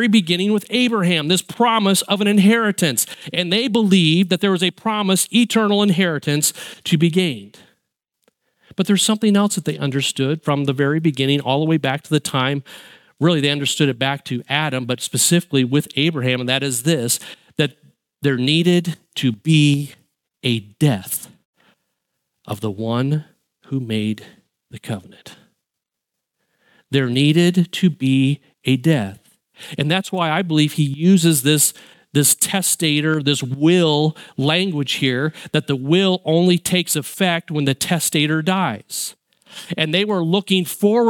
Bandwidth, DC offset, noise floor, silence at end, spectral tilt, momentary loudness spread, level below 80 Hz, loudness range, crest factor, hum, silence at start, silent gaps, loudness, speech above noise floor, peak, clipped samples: 17.5 kHz; under 0.1%; -82 dBFS; 0 s; -4.5 dB/octave; 9 LU; -66 dBFS; 8 LU; 18 dB; none; 0 s; 21.45-21.53 s; -18 LUFS; 64 dB; -2 dBFS; under 0.1%